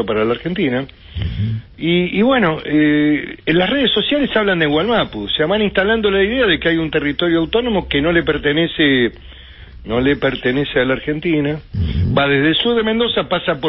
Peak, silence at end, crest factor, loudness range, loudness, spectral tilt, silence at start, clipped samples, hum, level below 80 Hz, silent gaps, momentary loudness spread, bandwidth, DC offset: -2 dBFS; 0 s; 14 dB; 2 LU; -16 LUFS; -11 dB/octave; 0 s; under 0.1%; none; -34 dBFS; none; 8 LU; 5.8 kHz; under 0.1%